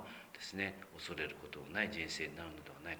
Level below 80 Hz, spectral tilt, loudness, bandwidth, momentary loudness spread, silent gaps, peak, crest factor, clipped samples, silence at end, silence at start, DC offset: -66 dBFS; -3.5 dB/octave; -43 LUFS; over 20 kHz; 11 LU; none; -20 dBFS; 24 dB; under 0.1%; 0 s; 0 s; under 0.1%